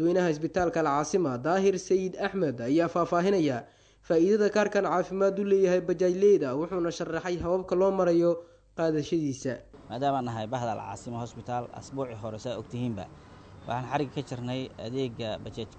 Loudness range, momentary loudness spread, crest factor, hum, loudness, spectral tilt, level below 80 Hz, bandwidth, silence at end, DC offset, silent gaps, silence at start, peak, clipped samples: 10 LU; 13 LU; 16 dB; none; -28 LUFS; -6.5 dB/octave; -58 dBFS; 9 kHz; 0 s; under 0.1%; none; 0 s; -12 dBFS; under 0.1%